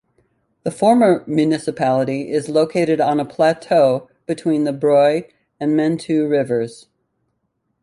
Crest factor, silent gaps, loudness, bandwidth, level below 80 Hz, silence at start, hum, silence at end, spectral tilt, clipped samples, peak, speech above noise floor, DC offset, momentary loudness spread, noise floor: 16 dB; none; -18 LUFS; 11.5 kHz; -62 dBFS; 0.65 s; none; 1.1 s; -6.5 dB/octave; under 0.1%; -2 dBFS; 54 dB; under 0.1%; 10 LU; -71 dBFS